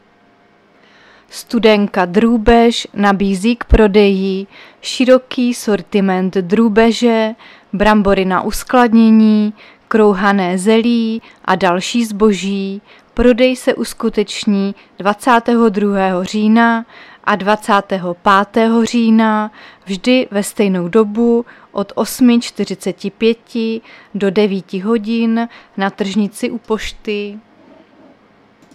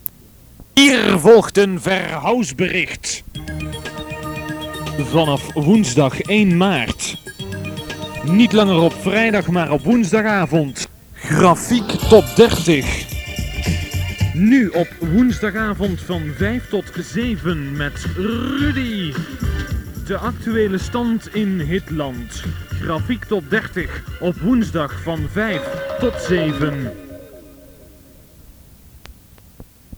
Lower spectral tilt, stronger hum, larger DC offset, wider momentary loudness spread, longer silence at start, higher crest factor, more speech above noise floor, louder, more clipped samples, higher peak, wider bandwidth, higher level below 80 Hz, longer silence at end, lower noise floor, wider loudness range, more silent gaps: about the same, -5.5 dB/octave vs -5.5 dB/octave; neither; neither; second, 11 LU vs 15 LU; first, 1.35 s vs 0.05 s; about the same, 14 dB vs 18 dB; first, 37 dB vs 28 dB; first, -14 LUFS vs -18 LUFS; neither; about the same, 0 dBFS vs 0 dBFS; second, 14 kHz vs over 20 kHz; about the same, -32 dBFS vs -34 dBFS; first, 1.35 s vs 0 s; first, -50 dBFS vs -45 dBFS; about the same, 5 LU vs 7 LU; neither